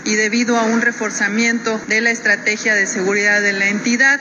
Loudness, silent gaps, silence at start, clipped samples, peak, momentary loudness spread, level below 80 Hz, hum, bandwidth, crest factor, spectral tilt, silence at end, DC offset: -15 LUFS; none; 0 s; under 0.1%; -4 dBFS; 4 LU; -64 dBFS; none; 9 kHz; 12 dB; -2.5 dB/octave; 0 s; under 0.1%